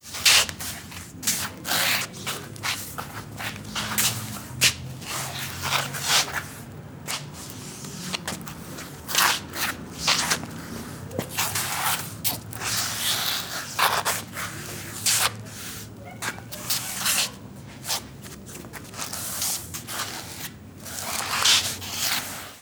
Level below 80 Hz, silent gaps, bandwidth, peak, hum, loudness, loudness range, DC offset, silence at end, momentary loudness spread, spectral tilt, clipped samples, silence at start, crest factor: -54 dBFS; none; over 20 kHz; -4 dBFS; none; -25 LUFS; 4 LU; under 0.1%; 0 s; 16 LU; -1 dB/octave; under 0.1%; 0.05 s; 24 dB